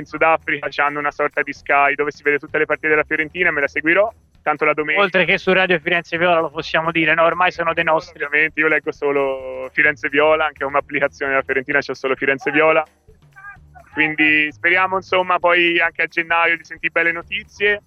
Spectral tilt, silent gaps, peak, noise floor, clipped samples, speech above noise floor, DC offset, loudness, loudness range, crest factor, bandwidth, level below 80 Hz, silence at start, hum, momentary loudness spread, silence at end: -5 dB/octave; none; 0 dBFS; -41 dBFS; under 0.1%; 23 dB; under 0.1%; -17 LUFS; 2 LU; 18 dB; 7.2 kHz; -52 dBFS; 0 s; none; 6 LU; 0.05 s